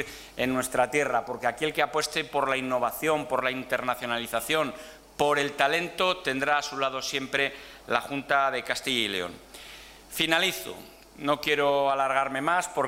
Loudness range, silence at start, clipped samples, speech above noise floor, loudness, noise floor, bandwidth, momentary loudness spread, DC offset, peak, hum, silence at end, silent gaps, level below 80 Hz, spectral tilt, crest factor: 2 LU; 0 s; under 0.1%; 20 dB; -27 LUFS; -47 dBFS; 16 kHz; 12 LU; under 0.1%; -6 dBFS; none; 0 s; none; -60 dBFS; -3 dB/octave; 22 dB